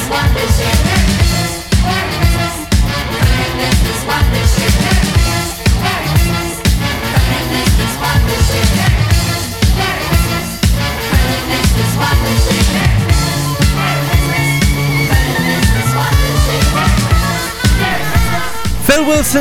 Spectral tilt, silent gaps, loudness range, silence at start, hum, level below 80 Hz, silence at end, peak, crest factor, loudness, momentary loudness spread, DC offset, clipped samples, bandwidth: -4.5 dB/octave; none; 1 LU; 0 s; none; -18 dBFS; 0 s; 0 dBFS; 12 dB; -13 LUFS; 3 LU; under 0.1%; under 0.1%; 17 kHz